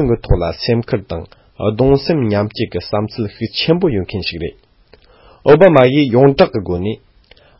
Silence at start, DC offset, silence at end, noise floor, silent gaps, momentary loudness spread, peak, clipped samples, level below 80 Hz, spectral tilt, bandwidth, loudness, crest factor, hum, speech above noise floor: 0 s; under 0.1%; 0.65 s; -48 dBFS; none; 13 LU; 0 dBFS; under 0.1%; -30 dBFS; -9.5 dB/octave; 5.8 kHz; -14 LUFS; 14 dB; none; 34 dB